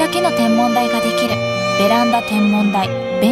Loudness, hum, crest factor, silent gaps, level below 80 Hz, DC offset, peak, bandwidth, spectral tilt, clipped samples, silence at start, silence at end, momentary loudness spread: -15 LUFS; none; 12 dB; none; -50 dBFS; under 0.1%; -2 dBFS; 16 kHz; -5 dB/octave; under 0.1%; 0 s; 0 s; 4 LU